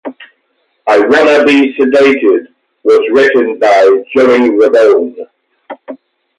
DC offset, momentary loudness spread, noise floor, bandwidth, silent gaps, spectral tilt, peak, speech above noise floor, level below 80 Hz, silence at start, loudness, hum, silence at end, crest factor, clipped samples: under 0.1%; 15 LU; -60 dBFS; 10.5 kHz; none; -4.5 dB/octave; 0 dBFS; 52 dB; -58 dBFS; 0.05 s; -8 LUFS; none; 0.45 s; 10 dB; under 0.1%